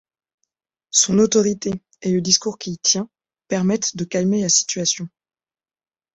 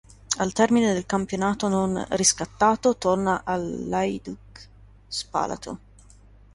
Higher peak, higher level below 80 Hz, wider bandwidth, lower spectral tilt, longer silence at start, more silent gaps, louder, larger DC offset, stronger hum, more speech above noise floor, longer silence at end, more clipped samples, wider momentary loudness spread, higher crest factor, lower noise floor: first, -2 dBFS vs -6 dBFS; second, -58 dBFS vs -50 dBFS; second, 8.4 kHz vs 11.5 kHz; about the same, -3.5 dB/octave vs -4 dB/octave; first, 0.95 s vs 0.3 s; neither; first, -19 LUFS vs -24 LUFS; neither; second, none vs 50 Hz at -45 dBFS; first, over 71 dB vs 27 dB; first, 1.05 s vs 0.8 s; neither; second, 11 LU vs 14 LU; about the same, 20 dB vs 20 dB; first, under -90 dBFS vs -51 dBFS